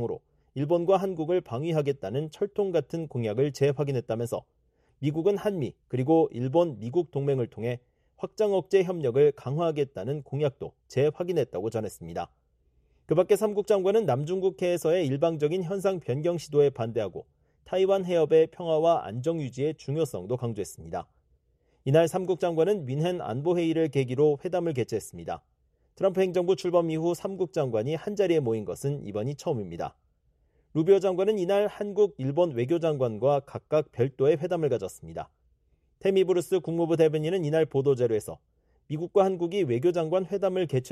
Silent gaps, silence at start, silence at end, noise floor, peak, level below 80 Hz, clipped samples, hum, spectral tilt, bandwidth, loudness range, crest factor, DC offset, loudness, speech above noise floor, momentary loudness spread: none; 0 s; 0 s; -68 dBFS; -10 dBFS; -64 dBFS; under 0.1%; none; -7 dB/octave; 13.5 kHz; 3 LU; 18 dB; under 0.1%; -27 LUFS; 42 dB; 10 LU